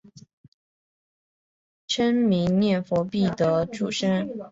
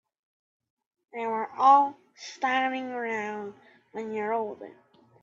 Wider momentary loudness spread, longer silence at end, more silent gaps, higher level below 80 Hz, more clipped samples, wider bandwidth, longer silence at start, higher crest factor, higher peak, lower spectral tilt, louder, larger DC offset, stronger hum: second, 5 LU vs 23 LU; second, 0.05 s vs 0.55 s; first, 0.33-1.88 s vs none; first, -58 dBFS vs -82 dBFS; neither; about the same, 8 kHz vs 7.6 kHz; second, 0.15 s vs 1.15 s; second, 14 dB vs 20 dB; about the same, -10 dBFS vs -10 dBFS; first, -6 dB/octave vs -4 dB/octave; first, -24 LUFS vs -27 LUFS; neither; neither